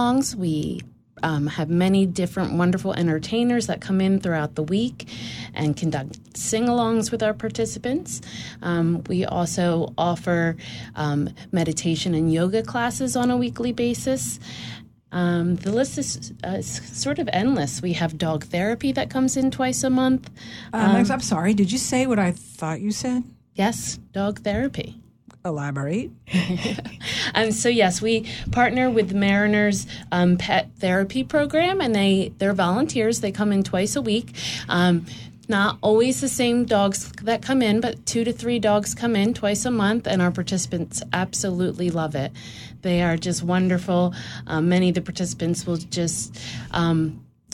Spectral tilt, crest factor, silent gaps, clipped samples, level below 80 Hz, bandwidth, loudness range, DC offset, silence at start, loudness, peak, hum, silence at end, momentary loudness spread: -5 dB/octave; 18 dB; none; under 0.1%; -48 dBFS; 15 kHz; 4 LU; under 0.1%; 0 s; -23 LUFS; -4 dBFS; none; 0.3 s; 9 LU